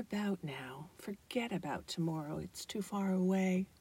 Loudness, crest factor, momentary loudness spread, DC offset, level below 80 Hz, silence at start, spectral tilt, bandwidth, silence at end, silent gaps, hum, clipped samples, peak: -38 LUFS; 14 dB; 14 LU; under 0.1%; -68 dBFS; 0 s; -6 dB/octave; 16 kHz; 0.15 s; none; none; under 0.1%; -22 dBFS